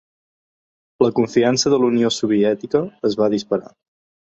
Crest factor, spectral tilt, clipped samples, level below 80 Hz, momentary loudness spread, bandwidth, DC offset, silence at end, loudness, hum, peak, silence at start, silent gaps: 18 dB; -5 dB/octave; under 0.1%; -58 dBFS; 6 LU; 8.2 kHz; under 0.1%; 0.6 s; -18 LUFS; none; -2 dBFS; 1 s; none